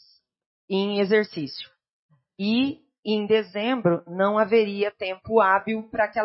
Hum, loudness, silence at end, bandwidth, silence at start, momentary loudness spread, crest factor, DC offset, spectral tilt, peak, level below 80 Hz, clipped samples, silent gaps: none; -24 LUFS; 0 s; 5.8 kHz; 0.7 s; 12 LU; 18 dB; under 0.1%; -9.5 dB/octave; -6 dBFS; -64 dBFS; under 0.1%; 1.90-2.09 s, 2.99-3.03 s